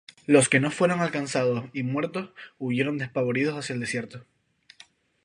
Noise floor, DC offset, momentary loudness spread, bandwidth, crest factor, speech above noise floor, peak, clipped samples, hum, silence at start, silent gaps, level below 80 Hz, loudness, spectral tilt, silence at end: -56 dBFS; under 0.1%; 12 LU; 11.5 kHz; 22 dB; 30 dB; -4 dBFS; under 0.1%; none; 0.3 s; none; -68 dBFS; -25 LUFS; -5 dB/octave; 1.05 s